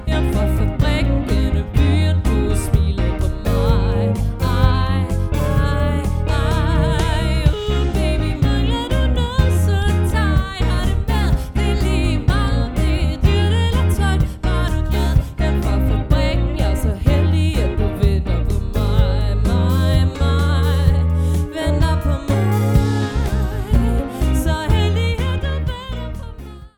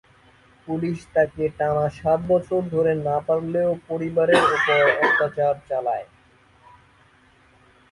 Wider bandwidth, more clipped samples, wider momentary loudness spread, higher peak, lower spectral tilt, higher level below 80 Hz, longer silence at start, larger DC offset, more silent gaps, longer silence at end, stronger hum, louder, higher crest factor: first, 17.5 kHz vs 11.5 kHz; neither; second, 4 LU vs 10 LU; about the same, 0 dBFS vs -2 dBFS; about the same, -6.5 dB/octave vs -6 dB/octave; first, -20 dBFS vs -54 dBFS; second, 0 s vs 0.65 s; neither; neither; second, 0.1 s vs 1.9 s; neither; first, -18 LUFS vs -21 LUFS; about the same, 16 dB vs 20 dB